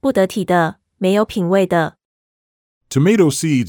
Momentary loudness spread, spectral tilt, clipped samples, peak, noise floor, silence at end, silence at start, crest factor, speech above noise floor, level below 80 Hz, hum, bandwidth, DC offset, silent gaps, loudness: 8 LU; -6 dB/octave; under 0.1%; -2 dBFS; under -90 dBFS; 0 s; 0.05 s; 16 dB; over 75 dB; -54 dBFS; none; 18.5 kHz; under 0.1%; 2.05-2.81 s; -16 LUFS